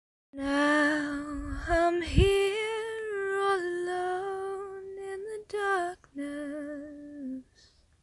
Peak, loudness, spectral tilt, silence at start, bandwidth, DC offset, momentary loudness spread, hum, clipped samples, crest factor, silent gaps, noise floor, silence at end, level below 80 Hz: -8 dBFS; -30 LUFS; -5.5 dB/octave; 0.35 s; 11.5 kHz; under 0.1%; 16 LU; none; under 0.1%; 22 dB; none; -62 dBFS; 0.6 s; -42 dBFS